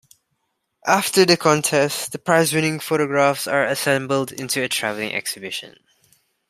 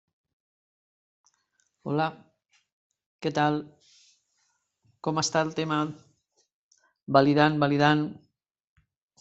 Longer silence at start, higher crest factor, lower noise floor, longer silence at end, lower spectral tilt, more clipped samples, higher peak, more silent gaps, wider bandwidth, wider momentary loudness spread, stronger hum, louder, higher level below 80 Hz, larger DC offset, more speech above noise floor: second, 0.85 s vs 1.85 s; about the same, 20 dB vs 24 dB; about the same, -73 dBFS vs -74 dBFS; second, 0.8 s vs 1.05 s; second, -3.5 dB/octave vs -5.5 dB/octave; neither; about the same, -2 dBFS vs -4 dBFS; second, none vs 2.72-2.90 s, 3.06-3.19 s, 6.54-6.71 s; first, 16 kHz vs 8.2 kHz; second, 10 LU vs 13 LU; neither; first, -19 LUFS vs -26 LUFS; about the same, -64 dBFS vs -68 dBFS; neither; first, 53 dB vs 49 dB